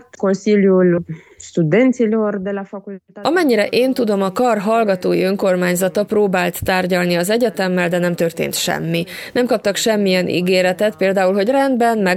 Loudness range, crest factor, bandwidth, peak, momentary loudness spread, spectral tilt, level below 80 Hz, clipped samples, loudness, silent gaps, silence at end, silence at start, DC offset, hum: 1 LU; 14 dB; 16.5 kHz; -2 dBFS; 7 LU; -5 dB/octave; -52 dBFS; under 0.1%; -16 LUFS; none; 0 s; 0.2 s; under 0.1%; none